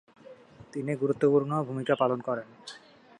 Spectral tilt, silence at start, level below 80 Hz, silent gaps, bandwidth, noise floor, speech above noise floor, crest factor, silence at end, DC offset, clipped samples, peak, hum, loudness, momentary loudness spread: -7.5 dB/octave; 0.25 s; -72 dBFS; none; 10.5 kHz; -51 dBFS; 23 dB; 20 dB; 0.4 s; under 0.1%; under 0.1%; -10 dBFS; none; -28 LUFS; 21 LU